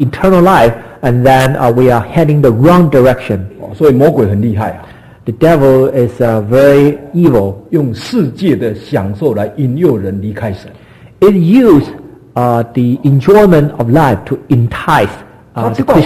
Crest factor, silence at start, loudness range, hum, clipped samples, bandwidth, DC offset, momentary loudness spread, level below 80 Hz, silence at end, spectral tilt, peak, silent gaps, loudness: 10 dB; 0 s; 4 LU; none; 0.5%; 14.5 kHz; under 0.1%; 12 LU; -34 dBFS; 0 s; -8 dB/octave; 0 dBFS; none; -10 LUFS